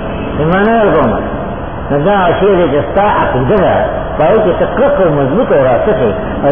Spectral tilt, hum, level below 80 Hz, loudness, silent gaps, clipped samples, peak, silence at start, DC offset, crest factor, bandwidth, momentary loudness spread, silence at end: -11 dB/octave; none; -28 dBFS; -11 LUFS; none; under 0.1%; 0 dBFS; 0 s; 3%; 10 dB; 3.6 kHz; 7 LU; 0 s